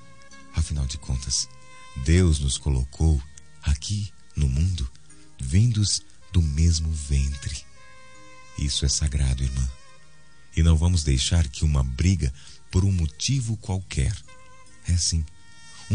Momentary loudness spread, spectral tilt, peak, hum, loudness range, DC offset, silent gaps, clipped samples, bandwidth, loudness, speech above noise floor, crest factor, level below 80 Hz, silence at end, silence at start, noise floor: 12 LU; -4.5 dB/octave; -6 dBFS; none; 3 LU; 0.6%; none; under 0.1%; 10 kHz; -25 LUFS; 32 dB; 18 dB; -30 dBFS; 0 s; 0.3 s; -55 dBFS